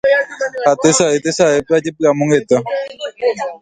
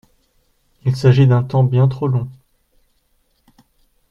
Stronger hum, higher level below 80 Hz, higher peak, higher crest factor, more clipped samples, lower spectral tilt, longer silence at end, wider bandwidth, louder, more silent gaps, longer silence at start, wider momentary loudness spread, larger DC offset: neither; about the same, -54 dBFS vs -50 dBFS; about the same, 0 dBFS vs 0 dBFS; about the same, 14 dB vs 18 dB; neither; second, -4 dB/octave vs -9 dB/octave; second, 0.05 s vs 1.8 s; first, 9.6 kHz vs 6.8 kHz; about the same, -15 LUFS vs -16 LUFS; neither; second, 0.05 s vs 0.85 s; about the same, 9 LU vs 11 LU; neither